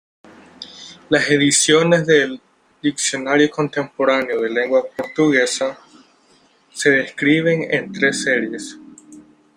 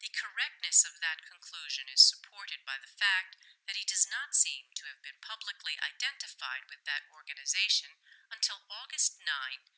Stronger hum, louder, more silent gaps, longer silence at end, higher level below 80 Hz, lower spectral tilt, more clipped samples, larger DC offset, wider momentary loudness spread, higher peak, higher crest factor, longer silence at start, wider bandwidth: neither; first, -17 LUFS vs -30 LUFS; neither; first, 0.35 s vs 0.2 s; first, -62 dBFS vs under -90 dBFS; first, -3.5 dB/octave vs 11 dB/octave; neither; neither; about the same, 19 LU vs 19 LU; first, 0 dBFS vs -10 dBFS; second, 18 dB vs 24 dB; first, 0.6 s vs 0 s; first, 16 kHz vs 8 kHz